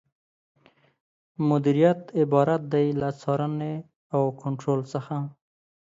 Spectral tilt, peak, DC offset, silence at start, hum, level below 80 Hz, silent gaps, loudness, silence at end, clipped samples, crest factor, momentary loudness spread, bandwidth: -8.5 dB/octave; -8 dBFS; under 0.1%; 1.4 s; none; -66 dBFS; 3.96-4.10 s; -25 LUFS; 0.65 s; under 0.1%; 18 dB; 11 LU; 7.8 kHz